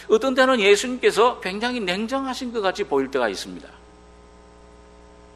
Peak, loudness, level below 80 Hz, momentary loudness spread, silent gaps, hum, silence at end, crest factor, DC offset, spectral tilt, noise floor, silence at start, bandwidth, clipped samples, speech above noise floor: -4 dBFS; -21 LUFS; -52 dBFS; 10 LU; none; 60 Hz at -50 dBFS; 1.65 s; 20 dB; under 0.1%; -3.5 dB/octave; -48 dBFS; 0 s; 13 kHz; under 0.1%; 27 dB